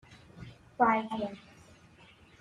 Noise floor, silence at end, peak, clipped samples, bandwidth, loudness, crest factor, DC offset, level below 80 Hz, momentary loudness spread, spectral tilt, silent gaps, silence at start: -58 dBFS; 1 s; -14 dBFS; under 0.1%; 11 kHz; -30 LUFS; 22 dB; under 0.1%; -66 dBFS; 23 LU; -6.5 dB/octave; none; 0.1 s